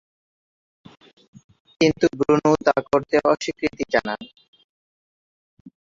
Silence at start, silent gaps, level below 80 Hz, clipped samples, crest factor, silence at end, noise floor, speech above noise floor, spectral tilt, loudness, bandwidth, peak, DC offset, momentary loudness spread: 1.8 s; 4.48-4.53 s, 4.64-5.65 s; -56 dBFS; under 0.1%; 20 dB; 0.25 s; under -90 dBFS; over 69 dB; -5.5 dB/octave; -21 LUFS; 7.6 kHz; -2 dBFS; under 0.1%; 8 LU